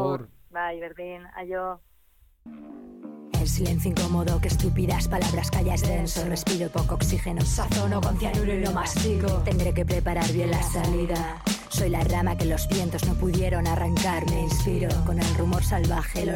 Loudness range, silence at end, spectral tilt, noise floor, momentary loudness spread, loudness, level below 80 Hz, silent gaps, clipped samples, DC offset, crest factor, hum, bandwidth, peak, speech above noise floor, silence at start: 4 LU; 0 s; -5.5 dB/octave; -59 dBFS; 10 LU; -26 LUFS; -32 dBFS; none; under 0.1%; under 0.1%; 10 dB; none; 17.5 kHz; -14 dBFS; 35 dB; 0 s